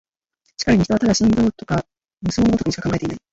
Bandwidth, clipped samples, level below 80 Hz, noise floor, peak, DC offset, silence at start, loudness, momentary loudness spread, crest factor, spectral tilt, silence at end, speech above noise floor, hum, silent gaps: 8 kHz; under 0.1%; -40 dBFS; -68 dBFS; -4 dBFS; under 0.1%; 0.6 s; -19 LUFS; 9 LU; 16 dB; -5.5 dB/octave; 0.15 s; 50 dB; none; none